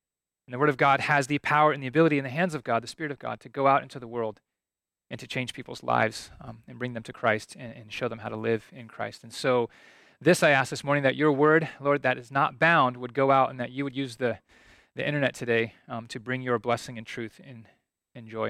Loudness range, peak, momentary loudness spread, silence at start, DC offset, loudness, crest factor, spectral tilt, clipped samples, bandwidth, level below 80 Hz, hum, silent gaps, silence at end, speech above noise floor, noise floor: 8 LU; -8 dBFS; 16 LU; 0.5 s; under 0.1%; -26 LUFS; 20 dB; -5.5 dB/octave; under 0.1%; 15 kHz; -66 dBFS; none; none; 0 s; over 63 dB; under -90 dBFS